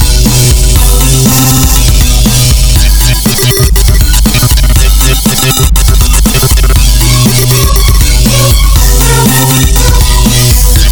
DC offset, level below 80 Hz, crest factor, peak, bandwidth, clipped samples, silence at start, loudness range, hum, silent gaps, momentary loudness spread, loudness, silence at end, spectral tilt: under 0.1%; -6 dBFS; 4 dB; 0 dBFS; over 20 kHz; 2%; 0 s; 1 LU; none; none; 2 LU; -6 LUFS; 0 s; -3.5 dB/octave